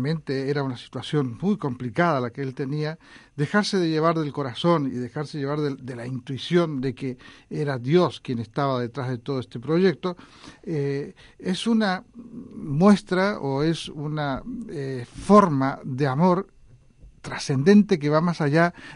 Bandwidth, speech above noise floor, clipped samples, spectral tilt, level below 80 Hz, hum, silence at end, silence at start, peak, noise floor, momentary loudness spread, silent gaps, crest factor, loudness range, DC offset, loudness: 11 kHz; 27 dB; under 0.1%; -7 dB/octave; -54 dBFS; none; 0 s; 0 s; -4 dBFS; -50 dBFS; 15 LU; none; 20 dB; 5 LU; under 0.1%; -24 LUFS